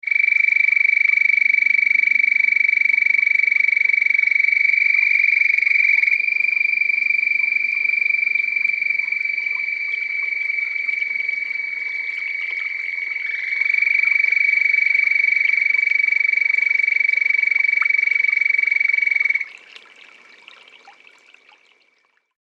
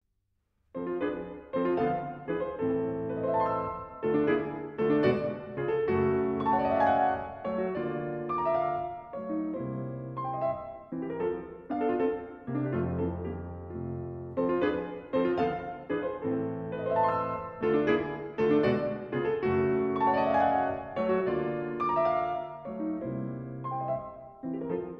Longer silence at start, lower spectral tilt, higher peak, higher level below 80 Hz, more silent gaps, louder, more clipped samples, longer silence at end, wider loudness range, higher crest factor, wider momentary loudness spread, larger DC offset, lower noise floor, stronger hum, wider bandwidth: second, 0.05 s vs 0.75 s; second, 1.5 dB/octave vs -9.5 dB/octave; first, -6 dBFS vs -14 dBFS; second, under -90 dBFS vs -58 dBFS; neither; first, -16 LUFS vs -30 LUFS; neither; first, 1.5 s vs 0 s; about the same, 7 LU vs 5 LU; about the same, 14 dB vs 16 dB; second, 8 LU vs 11 LU; neither; second, -63 dBFS vs -77 dBFS; neither; first, 7.4 kHz vs 6 kHz